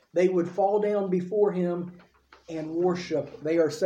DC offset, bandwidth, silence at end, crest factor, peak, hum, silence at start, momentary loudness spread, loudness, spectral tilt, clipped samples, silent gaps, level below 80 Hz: under 0.1%; 9.6 kHz; 0 s; 14 dB; -12 dBFS; none; 0.15 s; 10 LU; -27 LUFS; -7 dB/octave; under 0.1%; none; -68 dBFS